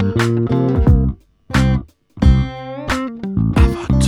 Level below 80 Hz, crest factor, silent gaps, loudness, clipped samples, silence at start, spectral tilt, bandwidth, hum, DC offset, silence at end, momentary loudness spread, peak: -20 dBFS; 14 dB; none; -17 LUFS; under 0.1%; 0 s; -7 dB/octave; 11.5 kHz; none; under 0.1%; 0 s; 8 LU; -2 dBFS